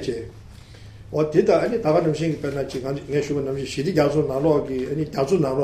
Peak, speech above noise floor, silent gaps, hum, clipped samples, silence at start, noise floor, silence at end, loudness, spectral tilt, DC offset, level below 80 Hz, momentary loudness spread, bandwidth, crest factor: -4 dBFS; 21 dB; none; none; under 0.1%; 0 s; -42 dBFS; 0 s; -22 LUFS; -7 dB/octave; under 0.1%; -48 dBFS; 8 LU; 14.5 kHz; 18 dB